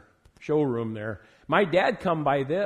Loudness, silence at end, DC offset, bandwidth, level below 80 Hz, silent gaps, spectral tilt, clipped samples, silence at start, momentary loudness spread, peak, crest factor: -25 LUFS; 0 s; under 0.1%; 10.5 kHz; -60 dBFS; none; -7.5 dB/octave; under 0.1%; 0.4 s; 14 LU; -6 dBFS; 20 dB